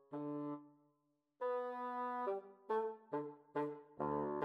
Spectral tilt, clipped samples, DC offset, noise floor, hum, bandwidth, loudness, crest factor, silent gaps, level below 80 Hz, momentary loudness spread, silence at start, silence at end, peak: -9 dB/octave; under 0.1%; under 0.1%; -82 dBFS; none; 5.4 kHz; -44 LUFS; 16 dB; none; -78 dBFS; 5 LU; 0.1 s; 0 s; -28 dBFS